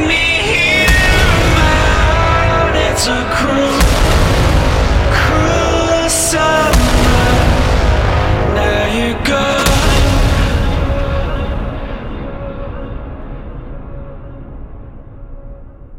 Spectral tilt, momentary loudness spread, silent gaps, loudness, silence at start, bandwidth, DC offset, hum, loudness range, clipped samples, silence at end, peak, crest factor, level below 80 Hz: -4.5 dB/octave; 18 LU; none; -12 LUFS; 0 s; 16.5 kHz; under 0.1%; none; 15 LU; under 0.1%; 0 s; -2 dBFS; 12 dB; -16 dBFS